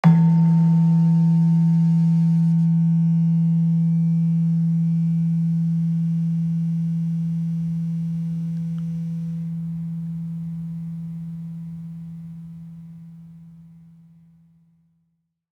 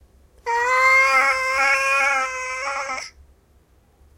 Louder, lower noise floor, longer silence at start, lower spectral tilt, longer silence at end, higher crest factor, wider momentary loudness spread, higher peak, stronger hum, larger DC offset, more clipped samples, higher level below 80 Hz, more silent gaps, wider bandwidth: second, -21 LUFS vs -18 LUFS; first, -72 dBFS vs -56 dBFS; second, 0.05 s vs 0.45 s; first, -10.5 dB/octave vs 0 dB/octave; first, 1.95 s vs 1.1 s; about the same, 16 dB vs 16 dB; first, 18 LU vs 15 LU; about the same, -4 dBFS vs -6 dBFS; neither; neither; neither; second, -62 dBFS vs -54 dBFS; neither; second, 2.6 kHz vs 16.5 kHz